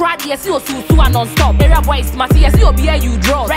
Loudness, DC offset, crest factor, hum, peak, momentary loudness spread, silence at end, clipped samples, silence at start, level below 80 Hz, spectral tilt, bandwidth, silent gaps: -13 LUFS; under 0.1%; 10 dB; none; 0 dBFS; 7 LU; 0 s; under 0.1%; 0 s; -12 dBFS; -5.5 dB/octave; 16.5 kHz; none